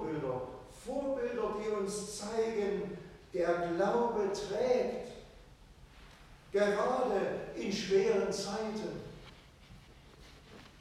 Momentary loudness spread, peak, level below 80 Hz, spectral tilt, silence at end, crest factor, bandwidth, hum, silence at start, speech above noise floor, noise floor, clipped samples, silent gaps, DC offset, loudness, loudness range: 17 LU; -18 dBFS; -60 dBFS; -5 dB/octave; 0 s; 18 dB; 13.5 kHz; none; 0 s; 24 dB; -57 dBFS; under 0.1%; none; under 0.1%; -34 LUFS; 3 LU